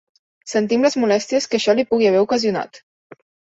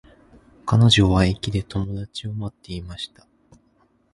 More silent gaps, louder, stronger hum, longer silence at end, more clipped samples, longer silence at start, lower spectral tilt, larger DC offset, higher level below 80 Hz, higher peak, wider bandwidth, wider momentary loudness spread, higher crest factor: neither; first, -18 LUFS vs -21 LUFS; neither; second, 0.8 s vs 1.05 s; neither; second, 0.45 s vs 0.65 s; about the same, -4.5 dB/octave vs -5.5 dB/octave; neither; second, -62 dBFS vs -38 dBFS; about the same, -4 dBFS vs -4 dBFS; second, 8 kHz vs 11.5 kHz; second, 9 LU vs 19 LU; about the same, 16 dB vs 20 dB